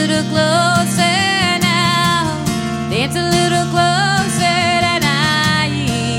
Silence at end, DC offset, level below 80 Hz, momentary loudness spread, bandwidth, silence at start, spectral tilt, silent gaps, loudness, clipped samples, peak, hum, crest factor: 0 s; under 0.1%; -42 dBFS; 5 LU; 16.5 kHz; 0 s; -4 dB/octave; none; -14 LUFS; under 0.1%; 0 dBFS; none; 14 dB